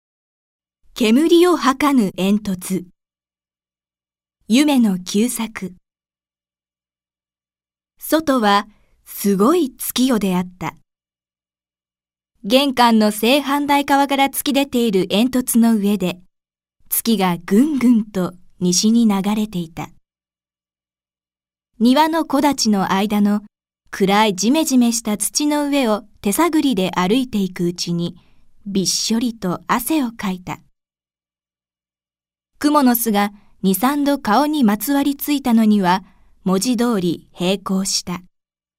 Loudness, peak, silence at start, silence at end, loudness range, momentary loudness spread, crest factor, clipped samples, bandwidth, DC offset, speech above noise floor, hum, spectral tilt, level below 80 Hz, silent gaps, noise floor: -17 LUFS; 0 dBFS; 0.95 s; 0.6 s; 5 LU; 11 LU; 18 dB; under 0.1%; 16 kHz; under 0.1%; over 73 dB; 60 Hz at -50 dBFS; -4.5 dB/octave; -52 dBFS; none; under -90 dBFS